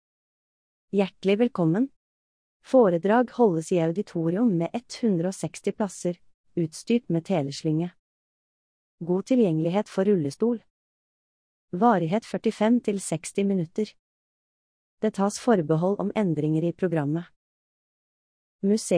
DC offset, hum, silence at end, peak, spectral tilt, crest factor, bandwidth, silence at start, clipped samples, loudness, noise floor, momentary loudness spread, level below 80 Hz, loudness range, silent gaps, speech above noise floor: under 0.1%; none; 0 s; -8 dBFS; -6.5 dB/octave; 18 dB; 10.5 kHz; 0.95 s; under 0.1%; -25 LUFS; under -90 dBFS; 9 LU; -70 dBFS; 4 LU; 1.96-2.60 s, 6.34-6.44 s, 7.99-8.98 s, 10.70-11.68 s, 13.99-14.98 s, 17.36-18.59 s; over 66 dB